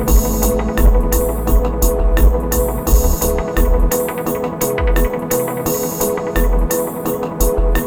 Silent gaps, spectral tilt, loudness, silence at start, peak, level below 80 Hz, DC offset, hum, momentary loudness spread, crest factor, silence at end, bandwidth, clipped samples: none; -5.5 dB/octave; -17 LUFS; 0 s; 0 dBFS; -16 dBFS; under 0.1%; none; 4 LU; 14 dB; 0 s; 18.5 kHz; under 0.1%